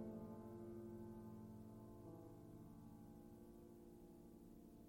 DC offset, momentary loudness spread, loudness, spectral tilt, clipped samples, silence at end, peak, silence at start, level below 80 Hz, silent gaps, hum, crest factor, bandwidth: under 0.1%; 8 LU; -59 LUFS; -8.5 dB/octave; under 0.1%; 0 s; -40 dBFS; 0 s; -72 dBFS; none; none; 18 dB; 16.5 kHz